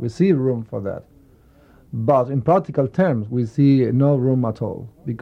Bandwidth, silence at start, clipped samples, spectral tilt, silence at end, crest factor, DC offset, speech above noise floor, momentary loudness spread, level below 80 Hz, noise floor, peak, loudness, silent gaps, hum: 7.6 kHz; 0 s; under 0.1%; -10 dB/octave; 0.05 s; 16 dB; under 0.1%; 32 dB; 14 LU; -54 dBFS; -51 dBFS; -4 dBFS; -19 LUFS; none; none